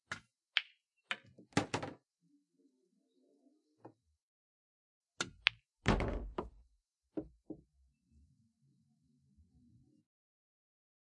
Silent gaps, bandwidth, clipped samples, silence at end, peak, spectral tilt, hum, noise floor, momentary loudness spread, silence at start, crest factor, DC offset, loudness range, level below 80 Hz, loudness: 4.22-5.01 s; 11 kHz; under 0.1%; 3.45 s; -4 dBFS; -4 dB/octave; none; -79 dBFS; 20 LU; 0.1 s; 40 dB; under 0.1%; 16 LU; -54 dBFS; -39 LUFS